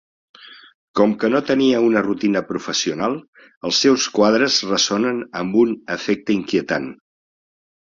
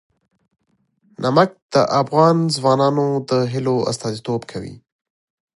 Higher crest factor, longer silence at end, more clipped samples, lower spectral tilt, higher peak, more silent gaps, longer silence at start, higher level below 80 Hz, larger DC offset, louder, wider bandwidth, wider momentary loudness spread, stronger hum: about the same, 18 dB vs 18 dB; first, 1 s vs 0.85 s; neither; second, -3.5 dB/octave vs -6 dB/octave; about the same, -2 dBFS vs -2 dBFS; first, 0.75-0.94 s, 3.28-3.33 s, 3.56-3.61 s vs 1.62-1.69 s; second, 0.4 s vs 1.2 s; about the same, -60 dBFS vs -58 dBFS; neither; about the same, -18 LUFS vs -18 LUFS; second, 7.6 kHz vs 11.5 kHz; about the same, 9 LU vs 11 LU; neither